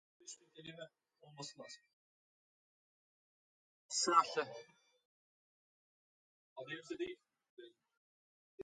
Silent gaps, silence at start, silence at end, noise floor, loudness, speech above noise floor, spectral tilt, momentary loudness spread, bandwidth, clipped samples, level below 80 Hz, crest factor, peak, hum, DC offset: 1.93-3.89 s, 5.05-6.56 s, 7.49-7.57 s, 7.97-8.58 s; 0.25 s; 0 s; under -90 dBFS; -38 LUFS; over 50 dB; -2 dB/octave; 26 LU; 11 kHz; under 0.1%; -90 dBFS; 28 dB; -16 dBFS; none; under 0.1%